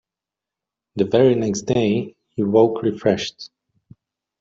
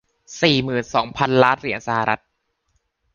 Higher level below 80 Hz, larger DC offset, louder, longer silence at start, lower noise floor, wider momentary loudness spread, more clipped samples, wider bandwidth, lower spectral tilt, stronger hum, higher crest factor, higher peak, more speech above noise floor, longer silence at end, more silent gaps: about the same, -56 dBFS vs -54 dBFS; neither; about the same, -19 LUFS vs -19 LUFS; first, 0.95 s vs 0.3 s; first, -87 dBFS vs -69 dBFS; first, 16 LU vs 7 LU; neither; about the same, 7.8 kHz vs 7.4 kHz; about the same, -6 dB/octave vs -5 dB/octave; neither; about the same, 18 dB vs 20 dB; about the same, -2 dBFS vs -2 dBFS; first, 69 dB vs 50 dB; about the same, 0.95 s vs 1 s; neither